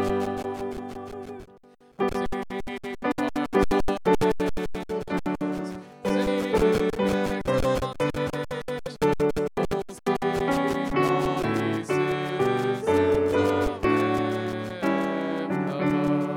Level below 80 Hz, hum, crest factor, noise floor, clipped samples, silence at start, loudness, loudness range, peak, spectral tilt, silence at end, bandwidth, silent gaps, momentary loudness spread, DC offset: -42 dBFS; none; 18 dB; -54 dBFS; under 0.1%; 0 s; -26 LUFS; 3 LU; -8 dBFS; -6.5 dB/octave; 0 s; 17.5 kHz; none; 10 LU; under 0.1%